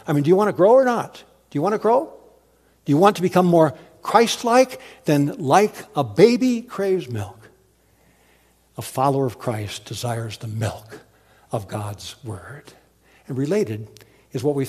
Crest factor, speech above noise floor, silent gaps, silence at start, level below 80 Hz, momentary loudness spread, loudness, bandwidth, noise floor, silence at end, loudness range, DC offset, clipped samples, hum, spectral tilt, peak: 20 dB; 39 dB; none; 0.05 s; -62 dBFS; 18 LU; -20 LUFS; 15 kHz; -58 dBFS; 0 s; 11 LU; under 0.1%; under 0.1%; none; -6 dB/octave; 0 dBFS